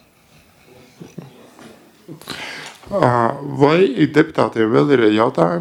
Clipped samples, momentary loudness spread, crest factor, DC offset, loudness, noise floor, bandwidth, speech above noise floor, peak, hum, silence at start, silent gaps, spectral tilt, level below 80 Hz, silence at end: under 0.1%; 21 LU; 18 dB; under 0.1%; -16 LUFS; -51 dBFS; 14 kHz; 35 dB; 0 dBFS; none; 1 s; none; -7 dB/octave; -56 dBFS; 0 s